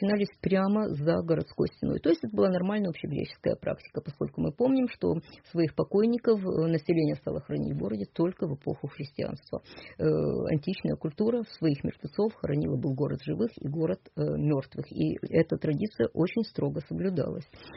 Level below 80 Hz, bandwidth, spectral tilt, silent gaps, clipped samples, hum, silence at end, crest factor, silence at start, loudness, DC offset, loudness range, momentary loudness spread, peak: -56 dBFS; 5.8 kHz; -7.5 dB/octave; none; under 0.1%; none; 0 s; 16 dB; 0 s; -30 LUFS; under 0.1%; 3 LU; 9 LU; -12 dBFS